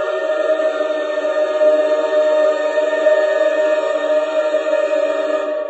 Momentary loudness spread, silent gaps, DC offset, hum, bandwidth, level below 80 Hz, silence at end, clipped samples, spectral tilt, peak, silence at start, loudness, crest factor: 5 LU; none; under 0.1%; none; 8.4 kHz; -70 dBFS; 0 s; under 0.1%; -1.5 dB/octave; -4 dBFS; 0 s; -17 LUFS; 12 dB